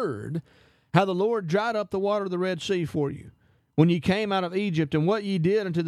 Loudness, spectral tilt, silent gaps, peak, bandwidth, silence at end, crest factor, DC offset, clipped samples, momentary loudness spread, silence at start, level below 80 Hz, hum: -26 LUFS; -7 dB/octave; none; -4 dBFS; 12 kHz; 0 s; 20 dB; under 0.1%; under 0.1%; 8 LU; 0 s; -60 dBFS; none